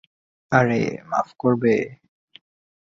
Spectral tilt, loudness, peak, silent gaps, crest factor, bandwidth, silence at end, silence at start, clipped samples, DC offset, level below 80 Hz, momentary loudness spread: -7.5 dB/octave; -21 LUFS; -4 dBFS; none; 20 dB; 7.4 kHz; 0.95 s; 0.5 s; under 0.1%; under 0.1%; -58 dBFS; 7 LU